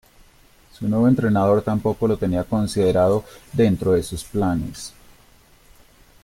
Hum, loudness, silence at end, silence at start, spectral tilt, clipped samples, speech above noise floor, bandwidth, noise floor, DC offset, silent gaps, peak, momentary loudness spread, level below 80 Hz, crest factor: none; -20 LUFS; 1.35 s; 0.8 s; -7 dB/octave; under 0.1%; 33 dB; 16.5 kHz; -52 dBFS; under 0.1%; none; -6 dBFS; 11 LU; -44 dBFS; 16 dB